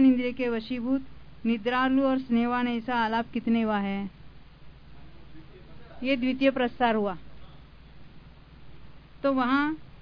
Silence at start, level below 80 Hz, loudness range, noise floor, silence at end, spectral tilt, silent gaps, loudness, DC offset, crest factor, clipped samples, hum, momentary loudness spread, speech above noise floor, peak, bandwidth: 0 s; -54 dBFS; 4 LU; -49 dBFS; 0.05 s; -8 dB/octave; none; -27 LUFS; 0.4%; 18 dB; under 0.1%; none; 8 LU; 23 dB; -10 dBFS; 5.4 kHz